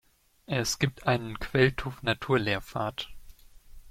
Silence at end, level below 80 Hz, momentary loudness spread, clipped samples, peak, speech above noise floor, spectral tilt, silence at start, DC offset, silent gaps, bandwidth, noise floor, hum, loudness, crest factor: 0 s; -48 dBFS; 9 LU; under 0.1%; -10 dBFS; 21 dB; -4.5 dB/octave; 0.5 s; under 0.1%; none; 16 kHz; -50 dBFS; none; -29 LUFS; 20 dB